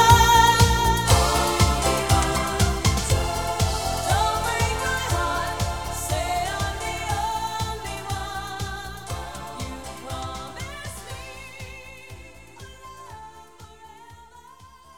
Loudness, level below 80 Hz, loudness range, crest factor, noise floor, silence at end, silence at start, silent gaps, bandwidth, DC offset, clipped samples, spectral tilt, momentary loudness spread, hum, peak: -23 LUFS; -32 dBFS; 18 LU; 22 dB; -48 dBFS; 0 s; 0 s; none; over 20 kHz; 0.5%; under 0.1%; -3.5 dB/octave; 22 LU; none; -2 dBFS